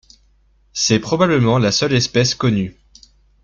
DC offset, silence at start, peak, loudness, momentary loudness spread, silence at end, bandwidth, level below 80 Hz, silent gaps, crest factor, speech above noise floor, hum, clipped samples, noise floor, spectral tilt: under 0.1%; 0.75 s; 0 dBFS; -16 LUFS; 7 LU; 0.75 s; 7.6 kHz; -46 dBFS; none; 18 dB; 40 dB; none; under 0.1%; -56 dBFS; -4.5 dB/octave